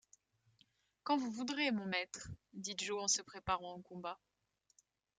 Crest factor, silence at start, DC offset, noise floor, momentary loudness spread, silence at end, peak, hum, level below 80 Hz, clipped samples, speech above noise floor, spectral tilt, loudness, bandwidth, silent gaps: 22 dB; 1.05 s; under 0.1%; -81 dBFS; 14 LU; 1 s; -22 dBFS; none; -70 dBFS; under 0.1%; 40 dB; -2.5 dB/octave; -39 LUFS; 10 kHz; none